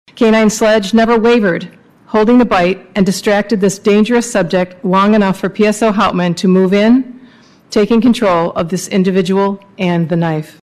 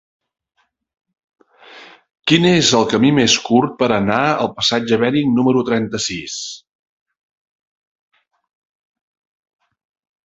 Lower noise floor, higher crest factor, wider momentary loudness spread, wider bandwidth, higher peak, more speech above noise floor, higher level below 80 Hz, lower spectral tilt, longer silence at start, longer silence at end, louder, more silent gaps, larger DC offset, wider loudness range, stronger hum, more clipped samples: about the same, -42 dBFS vs -42 dBFS; second, 10 dB vs 18 dB; second, 6 LU vs 12 LU; first, 14.5 kHz vs 8 kHz; about the same, -2 dBFS vs 0 dBFS; first, 31 dB vs 27 dB; first, -44 dBFS vs -54 dBFS; first, -6 dB/octave vs -4 dB/octave; second, 0.15 s vs 1.7 s; second, 0.15 s vs 3.7 s; first, -12 LUFS vs -15 LUFS; neither; neither; second, 2 LU vs 12 LU; neither; neither